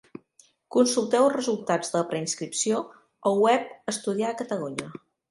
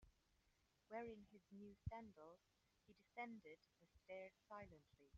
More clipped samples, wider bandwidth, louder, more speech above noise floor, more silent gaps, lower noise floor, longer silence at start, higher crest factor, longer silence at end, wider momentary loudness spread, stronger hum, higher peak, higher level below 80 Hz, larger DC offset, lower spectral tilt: neither; first, 11.5 kHz vs 7.2 kHz; first, -26 LUFS vs -59 LUFS; first, 36 dB vs 24 dB; neither; second, -61 dBFS vs -83 dBFS; first, 0.7 s vs 0 s; about the same, 18 dB vs 22 dB; first, 0.35 s vs 0 s; about the same, 10 LU vs 11 LU; neither; first, -8 dBFS vs -38 dBFS; about the same, -74 dBFS vs -74 dBFS; neither; second, -4 dB/octave vs -5.5 dB/octave